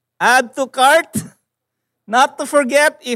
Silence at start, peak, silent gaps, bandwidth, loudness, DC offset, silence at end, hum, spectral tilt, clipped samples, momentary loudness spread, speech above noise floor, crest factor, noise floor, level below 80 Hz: 0.2 s; -2 dBFS; none; 16 kHz; -14 LUFS; under 0.1%; 0 s; none; -2.5 dB/octave; under 0.1%; 10 LU; 63 dB; 16 dB; -77 dBFS; -70 dBFS